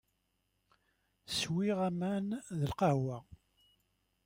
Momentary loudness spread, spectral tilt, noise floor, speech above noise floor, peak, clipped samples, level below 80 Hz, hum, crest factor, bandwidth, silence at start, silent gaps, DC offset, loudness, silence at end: 7 LU; -6 dB/octave; -80 dBFS; 46 dB; -18 dBFS; under 0.1%; -66 dBFS; none; 20 dB; 16.5 kHz; 1.3 s; none; under 0.1%; -35 LUFS; 0.9 s